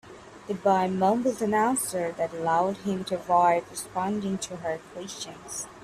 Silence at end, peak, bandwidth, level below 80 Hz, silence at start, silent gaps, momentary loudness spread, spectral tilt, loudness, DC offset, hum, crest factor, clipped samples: 0 s; -10 dBFS; 15.5 kHz; -64 dBFS; 0.05 s; none; 13 LU; -4.5 dB/octave; -27 LUFS; under 0.1%; none; 16 dB; under 0.1%